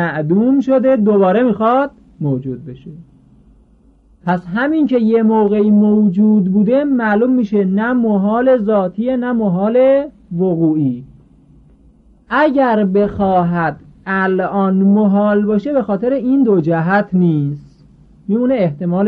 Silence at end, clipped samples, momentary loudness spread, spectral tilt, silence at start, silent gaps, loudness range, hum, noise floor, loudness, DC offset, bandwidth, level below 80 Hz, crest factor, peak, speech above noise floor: 0 s; under 0.1%; 9 LU; -10.5 dB/octave; 0 s; none; 4 LU; none; -49 dBFS; -14 LUFS; under 0.1%; 4.7 kHz; -48 dBFS; 12 dB; -4 dBFS; 36 dB